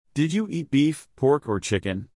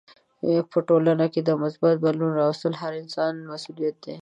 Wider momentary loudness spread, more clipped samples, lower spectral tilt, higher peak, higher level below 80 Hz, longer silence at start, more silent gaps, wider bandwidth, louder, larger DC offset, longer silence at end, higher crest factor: second, 4 LU vs 10 LU; neither; second, -6 dB/octave vs -7.5 dB/octave; about the same, -10 dBFS vs -8 dBFS; first, -58 dBFS vs -72 dBFS; second, 0.15 s vs 0.45 s; neither; first, 12 kHz vs 9.4 kHz; about the same, -24 LUFS vs -24 LUFS; neither; about the same, 0.1 s vs 0.05 s; about the same, 14 dB vs 14 dB